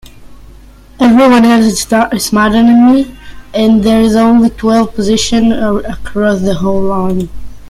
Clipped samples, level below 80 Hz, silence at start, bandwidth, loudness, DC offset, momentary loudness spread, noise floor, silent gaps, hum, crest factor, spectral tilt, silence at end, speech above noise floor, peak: under 0.1%; -32 dBFS; 0.2 s; 13.5 kHz; -10 LUFS; under 0.1%; 10 LU; -36 dBFS; none; none; 10 dB; -5 dB/octave; 0 s; 27 dB; 0 dBFS